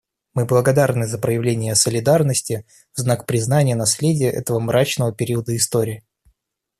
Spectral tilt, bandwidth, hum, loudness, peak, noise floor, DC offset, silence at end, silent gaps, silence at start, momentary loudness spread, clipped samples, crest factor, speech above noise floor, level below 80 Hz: -5 dB/octave; 14.5 kHz; none; -19 LUFS; 0 dBFS; -68 dBFS; under 0.1%; 0.8 s; none; 0.35 s; 9 LU; under 0.1%; 18 dB; 49 dB; -54 dBFS